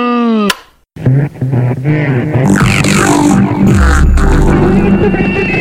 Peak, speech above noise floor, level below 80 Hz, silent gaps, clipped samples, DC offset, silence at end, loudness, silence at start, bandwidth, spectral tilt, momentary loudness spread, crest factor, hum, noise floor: 0 dBFS; 22 dB; -16 dBFS; none; under 0.1%; under 0.1%; 0 s; -10 LUFS; 0 s; 16.5 kHz; -6 dB/octave; 5 LU; 8 dB; none; -31 dBFS